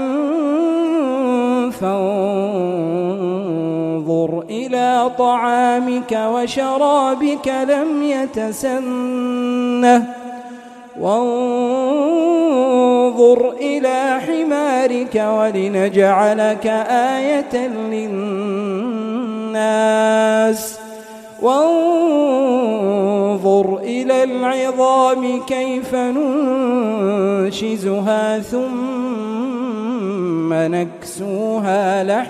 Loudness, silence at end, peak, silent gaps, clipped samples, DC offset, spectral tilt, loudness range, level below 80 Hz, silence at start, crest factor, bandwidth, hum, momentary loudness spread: -17 LUFS; 0 s; 0 dBFS; none; under 0.1%; under 0.1%; -5.5 dB/octave; 4 LU; -60 dBFS; 0 s; 16 dB; 15 kHz; none; 8 LU